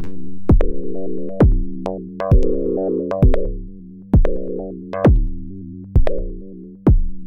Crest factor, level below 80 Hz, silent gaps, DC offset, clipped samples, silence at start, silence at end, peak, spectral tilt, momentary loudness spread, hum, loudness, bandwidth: 14 dB; -20 dBFS; none; under 0.1%; under 0.1%; 0 s; 0 s; -2 dBFS; -10.5 dB/octave; 17 LU; none; -20 LUFS; 4.1 kHz